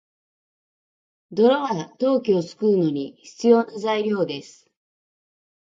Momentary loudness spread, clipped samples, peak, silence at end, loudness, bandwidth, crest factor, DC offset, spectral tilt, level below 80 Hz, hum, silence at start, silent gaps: 11 LU; under 0.1%; -4 dBFS; 1.35 s; -21 LUFS; 7.8 kHz; 18 dB; under 0.1%; -6.5 dB/octave; -72 dBFS; none; 1.3 s; none